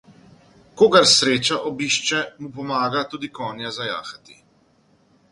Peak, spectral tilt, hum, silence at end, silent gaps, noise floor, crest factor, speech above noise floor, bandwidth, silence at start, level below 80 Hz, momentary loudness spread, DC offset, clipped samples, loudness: 0 dBFS; -2.5 dB/octave; none; 1.2 s; none; -59 dBFS; 22 dB; 39 dB; 11.5 kHz; 0.75 s; -62 dBFS; 17 LU; under 0.1%; under 0.1%; -19 LUFS